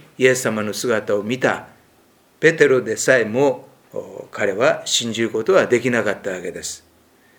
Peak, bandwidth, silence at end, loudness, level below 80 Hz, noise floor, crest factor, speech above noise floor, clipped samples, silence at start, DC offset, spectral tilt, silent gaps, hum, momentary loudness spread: 0 dBFS; 19.5 kHz; 0.6 s; -19 LUFS; -64 dBFS; -55 dBFS; 20 dB; 37 dB; under 0.1%; 0.2 s; under 0.1%; -3.5 dB/octave; none; none; 15 LU